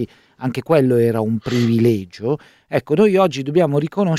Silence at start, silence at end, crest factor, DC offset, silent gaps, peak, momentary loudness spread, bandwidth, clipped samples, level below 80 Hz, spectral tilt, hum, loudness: 0 s; 0 s; 14 dB; under 0.1%; none; -2 dBFS; 11 LU; 15 kHz; under 0.1%; -56 dBFS; -7.5 dB/octave; none; -18 LUFS